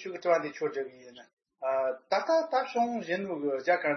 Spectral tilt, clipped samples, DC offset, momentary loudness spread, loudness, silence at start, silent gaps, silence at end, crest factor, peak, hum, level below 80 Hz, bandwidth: -5 dB/octave; under 0.1%; under 0.1%; 7 LU; -30 LUFS; 0 s; 1.33-1.37 s; 0 s; 18 dB; -12 dBFS; none; -84 dBFS; 6.4 kHz